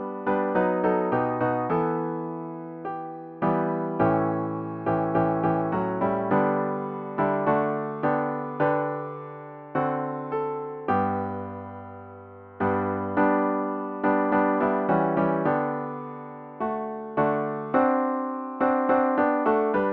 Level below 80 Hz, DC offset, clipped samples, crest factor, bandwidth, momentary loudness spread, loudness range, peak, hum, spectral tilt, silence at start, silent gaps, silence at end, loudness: -62 dBFS; under 0.1%; under 0.1%; 18 dB; 4.9 kHz; 13 LU; 4 LU; -8 dBFS; none; -11 dB/octave; 0 s; none; 0 s; -26 LUFS